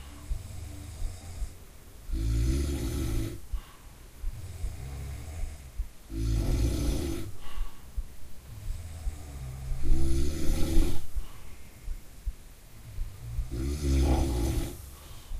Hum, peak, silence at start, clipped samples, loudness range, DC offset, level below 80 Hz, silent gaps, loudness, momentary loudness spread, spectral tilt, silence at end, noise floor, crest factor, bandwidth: none; -10 dBFS; 0 s; under 0.1%; 5 LU; under 0.1%; -32 dBFS; none; -34 LUFS; 19 LU; -6 dB/octave; 0 s; -49 dBFS; 20 dB; 15.5 kHz